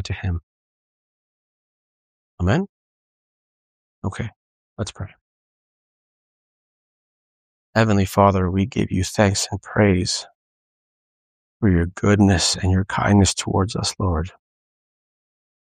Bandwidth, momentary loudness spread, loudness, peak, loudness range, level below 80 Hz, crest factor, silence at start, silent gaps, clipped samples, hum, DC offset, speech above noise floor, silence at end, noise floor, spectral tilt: 15 kHz; 15 LU; -20 LUFS; -2 dBFS; 16 LU; -42 dBFS; 22 dB; 0 s; 0.43-2.38 s, 2.69-4.02 s, 4.36-4.76 s, 5.21-7.73 s, 10.35-11.60 s; under 0.1%; none; under 0.1%; over 71 dB; 1.45 s; under -90 dBFS; -5 dB/octave